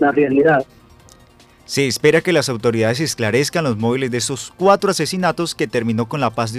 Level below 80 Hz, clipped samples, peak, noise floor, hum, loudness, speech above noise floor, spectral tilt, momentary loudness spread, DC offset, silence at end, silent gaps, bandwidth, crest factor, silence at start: -52 dBFS; under 0.1%; 0 dBFS; -48 dBFS; none; -17 LUFS; 31 dB; -4.5 dB/octave; 6 LU; under 0.1%; 0 s; none; 15.5 kHz; 18 dB; 0 s